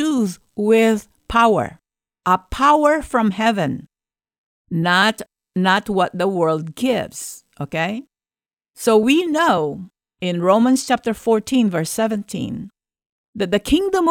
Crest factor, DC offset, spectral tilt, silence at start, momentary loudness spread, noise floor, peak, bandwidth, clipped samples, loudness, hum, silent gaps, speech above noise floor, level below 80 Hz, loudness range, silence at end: 16 dB; under 0.1%; -5 dB/octave; 0 s; 13 LU; under -90 dBFS; -4 dBFS; 17 kHz; under 0.1%; -18 LUFS; none; 4.38-4.65 s, 13.06-13.33 s; over 72 dB; -46 dBFS; 3 LU; 0 s